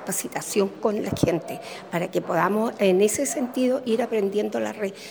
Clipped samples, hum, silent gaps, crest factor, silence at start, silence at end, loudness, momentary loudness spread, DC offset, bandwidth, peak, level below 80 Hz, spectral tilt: under 0.1%; none; none; 18 dB; 0 s; 0 s; -24 LUFS; 8 LU; under 0.1%; over 20 kHz; -6 dBFS; -56 dBFS; -4.5 dB/octave